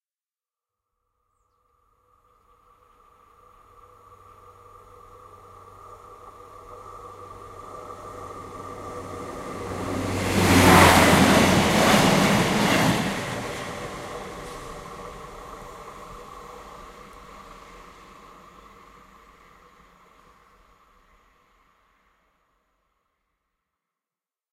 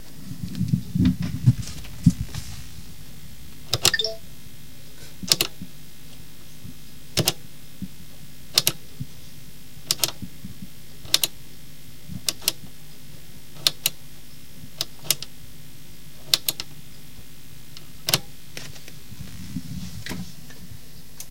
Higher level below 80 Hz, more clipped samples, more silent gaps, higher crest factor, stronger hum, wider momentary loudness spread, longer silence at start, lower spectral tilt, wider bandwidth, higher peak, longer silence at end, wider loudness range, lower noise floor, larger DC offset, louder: about the same, -46 dBFS vs -46 dBFS; neither; neither; about the same, 26 dB vs 30 dB; neither; first, 29 LU vs 23 LU; first, 5.9 s vs 0 s; first, -4.5 dB/octave vs -3 dB/octave; about the same, 16 kHz vs 17 kHz; about the same, 0 dBFS vs 0 dBFS; first, 7 s vs 0 s; first, 27 LU vs 6 LU; first, under -90 dBFS vs -46 dBFS; second, under 0.1% vs 2%; first, -19 LUFS vs -24 LUFS